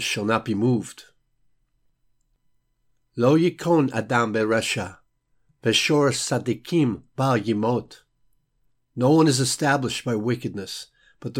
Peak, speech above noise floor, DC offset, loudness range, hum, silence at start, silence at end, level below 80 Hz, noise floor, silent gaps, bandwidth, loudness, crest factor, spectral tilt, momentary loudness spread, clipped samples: -6 dBFS; 47 dB; under 0.1%; 3 LU; none; 0 s; 0 s; -62 dBFS; -69 dBFS; none; 16.5 kHz; -22 LUFS; 18 dB; -5 dB/octave; 13 LU; under 0.1%